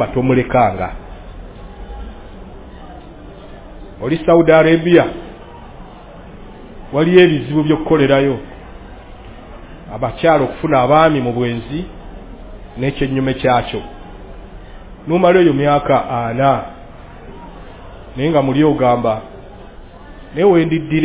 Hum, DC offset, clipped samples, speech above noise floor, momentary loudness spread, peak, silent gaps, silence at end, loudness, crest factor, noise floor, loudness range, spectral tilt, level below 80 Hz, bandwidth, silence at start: none; under 0.1%; under 0.1%; 22 dB; 26 LU; 0 dBFS; none; 0 s; -14 LUFS; 16 dB; -35 dBFS; 6 LU; -11 dB/octave; -36 dBFS; 4 kHz; 0 s